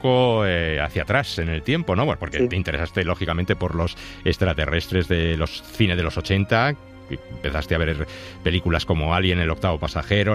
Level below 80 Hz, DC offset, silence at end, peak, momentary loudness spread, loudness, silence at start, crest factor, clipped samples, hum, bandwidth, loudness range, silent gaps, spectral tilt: -34 dBFS; under 0.1%; 0 s; -6 dBFS; 8 LU; -22 LUFS; 0 s; 16 dB; under 0.1%; none; 14.5 kHz; 1 LU; none; -6.5 dB/octave